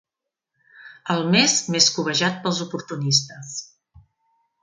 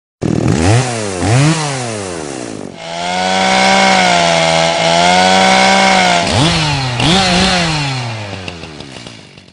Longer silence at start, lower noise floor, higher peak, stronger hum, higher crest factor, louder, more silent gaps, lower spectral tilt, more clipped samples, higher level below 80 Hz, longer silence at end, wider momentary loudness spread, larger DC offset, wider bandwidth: first, 0.8 s vs 0.2 s; first, -84 dBFS vs -34 dBFS; about the same, -2 dBFS vs 0 dBFS; neither; first, 22 dB vs 12 dB; second, -20 LUFS vs -11 LUFS; neither; about the same, -3 dB/octave vs -4 dB/octave; neither; second, -64 dBFS vs -36 dBFS; first, 1 s vs 0.3 s; about the same, 17 LU vs 16 LU; neither; about the same, 11 kHz vs 11 kHz